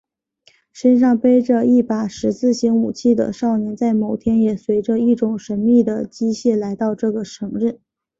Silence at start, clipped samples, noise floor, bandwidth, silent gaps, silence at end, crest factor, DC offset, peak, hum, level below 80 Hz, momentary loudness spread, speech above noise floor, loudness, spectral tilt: 0.75 s; under 0.1%; -57 dBFS; 7.8 kHz; none; 0.45 s; 14 dB; under 0.1%; -4 dBFS; none; -54 dBFS; 8 LU; 41 dB; -18 LUFS; -7 dB/octave